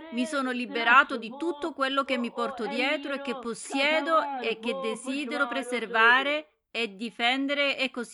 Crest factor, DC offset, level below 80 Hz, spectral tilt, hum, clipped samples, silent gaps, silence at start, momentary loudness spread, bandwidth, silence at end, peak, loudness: 22 dB; under 0.1%; -76 dBFS; -2.5 dB/octave; none; under 0.1%; none; 0 s; 12 LU; 12 kHz; 0 s; -6 dBFS; -26 LUFS